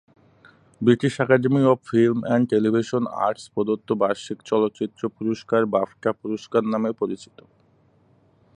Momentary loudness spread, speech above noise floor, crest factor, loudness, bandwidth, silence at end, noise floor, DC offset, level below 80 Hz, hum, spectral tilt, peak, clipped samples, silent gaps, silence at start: 9 LU; 38 dB; 20 dB; -22 LUFS; 10.5 kHz; 1.35 s; -60 dBFS; under 0.1%; -64 dBFS; none; -7 dB/octave; -4 dBFS; under 0.1%; none; 0.8 s